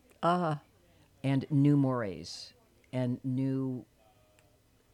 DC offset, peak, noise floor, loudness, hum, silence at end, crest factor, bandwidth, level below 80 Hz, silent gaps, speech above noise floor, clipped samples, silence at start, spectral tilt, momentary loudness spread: under 0.1%; -16 dBFS; -66 dBFS; -31 LUFS; none; 1.1 s; 18 dB; 10.5 kHz; -70 dBFS; none; 36 dB; under 0.1%; 0.2 s; -8 dB/octave; 16 LU